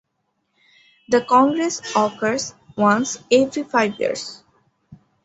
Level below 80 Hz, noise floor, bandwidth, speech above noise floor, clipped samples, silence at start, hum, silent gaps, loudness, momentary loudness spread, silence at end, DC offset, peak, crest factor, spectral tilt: -64 dBFS; -72 dBFS; 8.2 kHz; 54 dB; under 0.1%; 1.1 s; none; none; -19 LUFS; 10 LU; 0.3 s; under 0.1%; -2 dBFS; 18 dB; -4 dB/octave